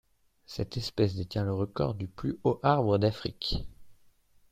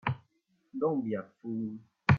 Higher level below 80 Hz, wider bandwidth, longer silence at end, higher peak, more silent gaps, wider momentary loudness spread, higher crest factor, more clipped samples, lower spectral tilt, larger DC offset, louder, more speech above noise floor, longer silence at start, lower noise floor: first, -48 dBFS vs -58 dBFS; first, 14.5 kHz vs 7 kHz; first, 0.6 s vs 0 s; about the same, -10 dBFS vs -10 dBFS; neither; about the same, 11 LU vs 10 LU; about the same, 20 dB vs 22 dB; neither; second, -7 dB/octave vs -9 dB/octave; neither; first, -30 LUFS vs -35 LUFS; second, 32 dB vs 40 dB; first, 0.5 s vs 0.05 s; second, -61 dBFS vs -74 dBFS